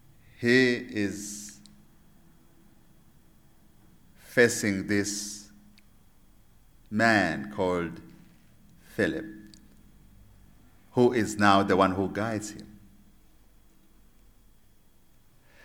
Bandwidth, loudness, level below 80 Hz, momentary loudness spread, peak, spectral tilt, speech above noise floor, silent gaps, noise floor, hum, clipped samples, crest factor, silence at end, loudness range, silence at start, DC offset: 19.5 kHz; -26 LUFS; -60 dBFS; 19 LU; -4 dBFS; -4.5 dB/octave; 32 dB; none; -57 dBFS; none; under 0.1%; 26 dB; 2.9 s; 11 LU; 0.4 s; under 0.1%